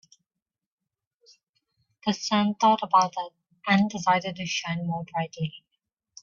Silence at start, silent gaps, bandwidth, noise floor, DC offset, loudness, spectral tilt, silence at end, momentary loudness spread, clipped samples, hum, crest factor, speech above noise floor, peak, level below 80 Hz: 2.05 s; none; 7.4 kHz; -88 dBFS; under 0.1%; -25 LUFS; -4.5 dB/octave; 0.65 s; 13 LU; under 0.1%; none; 20 dB; 63 dB; -8 dBFS; -70 dBFS